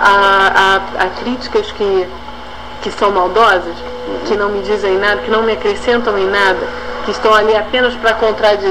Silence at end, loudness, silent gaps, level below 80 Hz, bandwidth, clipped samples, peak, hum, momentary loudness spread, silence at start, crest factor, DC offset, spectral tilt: 0 s; -13 LUFS; none; -38 dBFS; 14.5 kHz; under 0.1%; 0 dBFS; 60 Hz at -35 dBFS; 14 LU; 0 s; 14 dB; 2%; -4 dB/octave